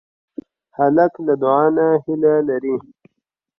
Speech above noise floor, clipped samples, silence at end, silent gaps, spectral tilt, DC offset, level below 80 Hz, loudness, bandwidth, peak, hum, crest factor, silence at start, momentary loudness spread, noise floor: 60 dB; under 0.1%; 0.8 s; none; -11 dB/octave; under 0.1%; -64 dBFS; -17 LUFS; 5.6 kHz; -2 dBFS; none; 16 dB; 0.8 s; 22 LU; -77 dBFS